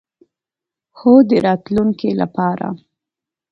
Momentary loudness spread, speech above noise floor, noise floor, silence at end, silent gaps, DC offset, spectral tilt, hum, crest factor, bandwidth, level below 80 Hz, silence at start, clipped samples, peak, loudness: 14 LU; 73 dB; -87 dBFS; 0.75 s; none; under 0.1%; -9 dB/octave; none; 16 dB; 5.8 kHz; -54 dBFS; 1 s; under 0.1%; 0 dBFS; -15 LUFS